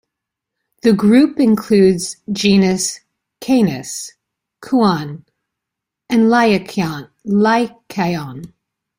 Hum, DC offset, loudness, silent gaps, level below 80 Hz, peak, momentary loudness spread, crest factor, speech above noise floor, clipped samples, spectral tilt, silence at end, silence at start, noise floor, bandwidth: none; under 0.1%; -15 LUFS; none; -54 dBFS; 0 dBFS; 17 LU; 16 dB; 67 dB; under 0.1%; -5.5 dB/octave; 0.5 s; 0.85 s; -82 dBFS; 16 kHz